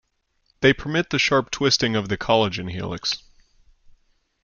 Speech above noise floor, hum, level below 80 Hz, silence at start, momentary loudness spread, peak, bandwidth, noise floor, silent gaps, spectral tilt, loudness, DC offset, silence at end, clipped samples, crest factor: 46 dB; none; -50 dBFS; 0.6 s; 8 LU; -2 dBFS; 7.4 kHz; -68 dBFS; none; -4 dB/octave; -21 LUFS; under 0.1%; 1.25 s; under 0.1%; 22 dB